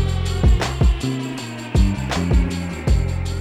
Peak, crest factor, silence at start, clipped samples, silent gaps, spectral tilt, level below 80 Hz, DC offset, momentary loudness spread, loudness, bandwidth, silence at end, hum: -4 dBFS; 14 dB; 0 s; under 0.1%; none; -6 dB/octave; -22 dBFS; under 0.1%; 6 LU; -21 LUFS; 12.5 kHz; 0 s; none